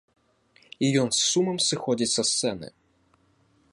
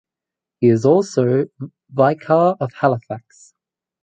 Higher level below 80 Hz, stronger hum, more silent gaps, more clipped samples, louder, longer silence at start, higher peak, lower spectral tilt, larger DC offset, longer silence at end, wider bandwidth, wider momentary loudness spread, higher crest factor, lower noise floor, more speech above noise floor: about the same, -66 dBFS vs -62 dBFS; neither; neither; neither; second, -24 LUFS vs -17 LUFS; first, 0.8 s vs 0.6 s; second, -10 dBFS vs -2 dBFS; second, -3 dB/octave vs -8 dB/octave; neither; first, 1.05 s vs 0.85 s; first, 11.5 kHz vs 9 kHz; second, 8 LU vs 14 LU; about the same, 16 dB vs 16 dB; second, -65 dBFS vs -87 dBFS; second, 40 dB vs 70 dB